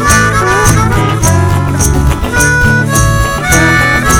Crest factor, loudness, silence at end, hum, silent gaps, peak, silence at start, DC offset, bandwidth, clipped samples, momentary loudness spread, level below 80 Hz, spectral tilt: 8 dB; -9 LUFS; 0 s; none; none; 0 dBFS; 0 s; under 0.1%; 19.5 kHz; 0.6%; 4 LU; -18 dBFS; -4 dB/octave